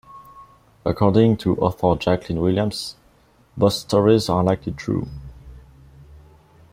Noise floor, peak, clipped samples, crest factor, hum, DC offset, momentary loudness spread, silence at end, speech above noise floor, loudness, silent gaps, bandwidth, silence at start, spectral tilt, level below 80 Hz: -55 dBFS; -2 dBFS; under 0.1%; 20 dB; none; under 0.1%; 15 LU; 0.55 s; 36 dB; -20 LUFS; none; 16 kHz; 0.15 s; -7 dB/octave; -46 dBFS